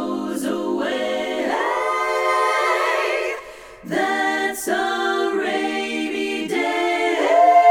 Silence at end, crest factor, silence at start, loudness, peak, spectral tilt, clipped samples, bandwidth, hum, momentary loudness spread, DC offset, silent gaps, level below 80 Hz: 0 s; 16 dB; 0 s; -20 LUFS; -4 dBFS; -3 dB/octave; under 0.1%; 18 kHz; none; 6 LU; under 0.1%; none; -60 dBFS